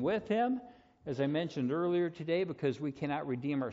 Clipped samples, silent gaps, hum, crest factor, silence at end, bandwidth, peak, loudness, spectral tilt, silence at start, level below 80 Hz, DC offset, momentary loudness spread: under 0.1%; none; none; 14 dB; 0 s; 7.6 kHz; -20 dBFS; -34 LUFS; -6 dB/octave; 0 s; -70 dBFS; under 0.1%; 6 LU